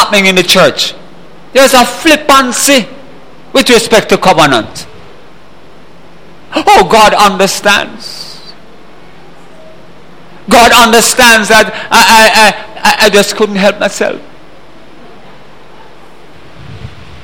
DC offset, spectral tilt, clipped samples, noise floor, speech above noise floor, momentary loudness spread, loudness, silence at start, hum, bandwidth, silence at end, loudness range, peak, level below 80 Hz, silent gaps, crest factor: 4%; -2.5 dB/octave; 3%; -37 dBFS; 31 dB; 17 LU; -6 LUFS; 0 s; none; over 20 kHz; 0.05 s; 8 LU; 0 dBFS; -36 dBFS; none; 10 dB